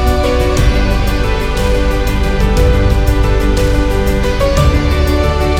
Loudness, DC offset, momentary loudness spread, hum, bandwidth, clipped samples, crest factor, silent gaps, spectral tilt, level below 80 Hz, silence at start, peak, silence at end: -13 LUFS; under 0.1%; 3 LU; none; 15.5 kHz; under 0.1%; 10 dB; none; -6 dB/octave; -14 dBFS; 0 s; 0 dBFS; 0 s